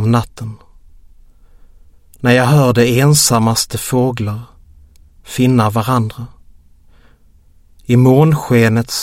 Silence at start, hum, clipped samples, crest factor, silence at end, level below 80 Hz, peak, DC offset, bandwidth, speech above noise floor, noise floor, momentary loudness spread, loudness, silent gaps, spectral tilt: 0 s; none; under 0.1%; 14 dB; 0 s; -42 dBFS; 0 dBFS; under 0.1%; 16.5 kHz; 34 dB; -47 dBFS; 18 LU; -13 LUFS; none; -5.5 dB/octave